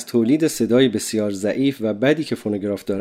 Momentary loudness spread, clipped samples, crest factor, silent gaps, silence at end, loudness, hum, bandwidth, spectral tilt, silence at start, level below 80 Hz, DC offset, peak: 7 LU; under 0.1%; 16 dB; none; 0 s; -20 LUFS; none; 16 kHz; -5 dB/octave; 0 s; -62 dBFS; under 0.1%; -4 dBFS